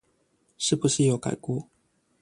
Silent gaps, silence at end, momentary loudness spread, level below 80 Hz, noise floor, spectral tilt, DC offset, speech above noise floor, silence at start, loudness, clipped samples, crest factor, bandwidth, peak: none; 0.6 s; 10 LU; -62 dBFS; -69 dBFS; -5 dB/octave; under 0.1%; 44 dB; 0.6 s; -26 LUFS; under 0.1%; 18 dB; 11.5 kHz; -10 dBFS